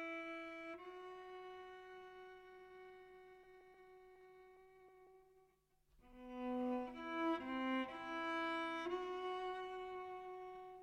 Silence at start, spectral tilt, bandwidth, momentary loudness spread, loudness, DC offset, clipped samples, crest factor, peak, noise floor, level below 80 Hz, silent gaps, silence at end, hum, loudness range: 0 s; -4.5 dB/octave; 12.5 kHz; 22 LU; -46 LUFS; under 0.1%; under 0.1%; 18 dB; -30 dBFS; -77 dBFS; -76 dBFS; none; 0 s; none; 20 LU